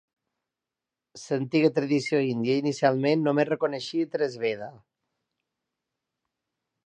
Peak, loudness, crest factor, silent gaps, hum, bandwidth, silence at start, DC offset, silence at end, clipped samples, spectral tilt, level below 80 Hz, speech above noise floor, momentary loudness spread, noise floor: -8 dBFS; -26 LUFS; 20 dB; none; none; 9.6 kHz; 1.15 s; under 0.1%; 2.1 s; under 0.1%; -6 dB/octave; -78 dBFS; 63 dB; 8 LU; -88 dBFS